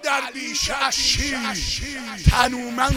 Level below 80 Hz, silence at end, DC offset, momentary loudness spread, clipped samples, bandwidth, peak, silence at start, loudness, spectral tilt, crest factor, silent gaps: -30 dBFS; 0 s; under 0.1%; 7 LU; under 0.1%; 16.5 kHz; 0 dBFS; 0 s; -21 LUFS; -3 dB/octave; 20 dB; none